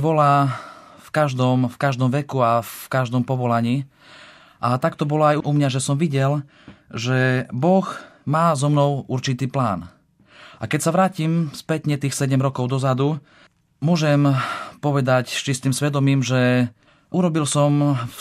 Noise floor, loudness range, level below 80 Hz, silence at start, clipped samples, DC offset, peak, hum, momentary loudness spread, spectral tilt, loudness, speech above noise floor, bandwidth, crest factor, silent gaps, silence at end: -49 dBFS; 2 LU; -62 dBFS; 0 s; under 0.1%; under 0.1%; -4 dBFS; none; 8 LU; -6 dB/octave; -20 LUFS; 29 dB; 14.5 kHz; 16 dB; none; 0 s